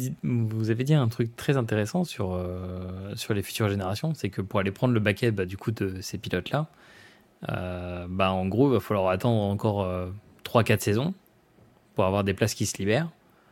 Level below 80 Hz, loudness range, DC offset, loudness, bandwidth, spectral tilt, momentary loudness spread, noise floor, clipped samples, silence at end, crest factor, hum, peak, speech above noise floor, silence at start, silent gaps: -58 dBFS; 3 LU; under 0.1%; -27 LUFS; 17 kHz; -6 dB/octave; 11 LU; -59 dBFS; under 0.1%; 0.4 s; 22 dB; none; -6 dBFS; 32 dB; 0 s; none